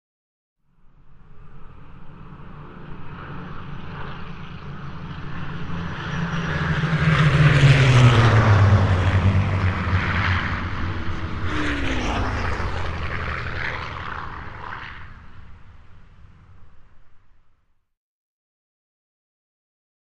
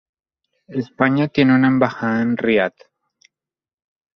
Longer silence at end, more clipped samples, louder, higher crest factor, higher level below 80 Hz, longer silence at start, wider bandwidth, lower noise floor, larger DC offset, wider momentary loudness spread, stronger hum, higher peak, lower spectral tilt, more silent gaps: first, 3 s vs 1.45 s; neither; about the same, -20 LUFS vs -18 LUFS; about the same, 20 dB vs 18 dB; first, -34 dBFS vs -58 dBFS; first, 1.05 s vs 0.7 s; first, 9.6 kHz vs 6.2 kHz; second, -60 dBFS vs under -90 dBFS; neither; first, 22 LU vs 13 LU; neither; about the same, -2 dBFS vs -2 dBFS; second, -6.5 dB/octave vs -8 dB/octave; neither